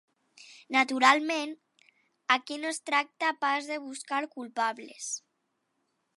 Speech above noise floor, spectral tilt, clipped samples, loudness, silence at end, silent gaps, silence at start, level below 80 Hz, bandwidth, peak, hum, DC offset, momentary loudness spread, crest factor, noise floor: 50 dB; -0.5 dB/octave; under 0.1%; -29 LUFS; 1 s; none; 0.4 s; -90 dBFS; 11.5 kHz; -6 dBFS; none; under 0.1%; 16 LU; 26 dB; -79 dBFS